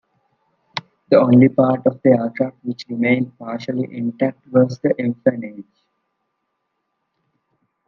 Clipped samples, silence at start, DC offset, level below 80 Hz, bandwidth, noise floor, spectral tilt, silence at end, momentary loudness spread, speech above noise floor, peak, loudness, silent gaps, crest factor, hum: under 0.1%; 0.75 s; under 0.1%; -64 dBFS; 6.2 kHz; -74 dBFS; -8.5 dB/octave; 2.25 s; 18 LU; 56 dB; 0 dBFS; -18 LUFS; none; 18 dB; none